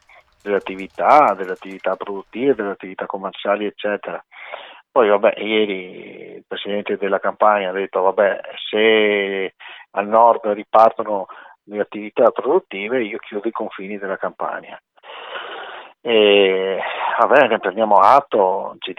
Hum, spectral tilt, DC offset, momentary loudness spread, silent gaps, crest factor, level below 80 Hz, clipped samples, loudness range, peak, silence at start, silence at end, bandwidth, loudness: none; -6 dB/octave; under 0.1%; 18 LU; none; 18 dB; -68 dBFS; under 0.1%; 7 LU; 0 dBFS; 0.45 s; 0.05 s; 7.2 kHz; -18 LUFS